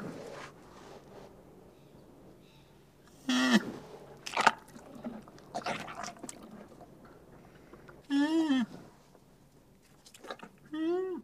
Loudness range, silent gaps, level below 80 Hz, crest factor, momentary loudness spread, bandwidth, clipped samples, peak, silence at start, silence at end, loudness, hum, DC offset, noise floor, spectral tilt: 11 LU; none; -68 dBFS; 32 dB; 26 LU; 15.5 kHz; under 0.1%; -4 dBFS; 0 s; 0 s; -33 LUFS; none; under 0.1%; -61 dBFS; -4 dB/octave